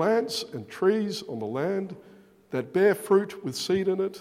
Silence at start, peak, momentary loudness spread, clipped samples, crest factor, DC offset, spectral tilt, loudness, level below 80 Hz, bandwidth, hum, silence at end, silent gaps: 0 s; -10 dBFS; 11 LU; under 0.1%; 18 dB; under 0.1%; -5 dB/octave; -27 LUFS; -72 dBFS; 15.5 kHz; none; 0 s; none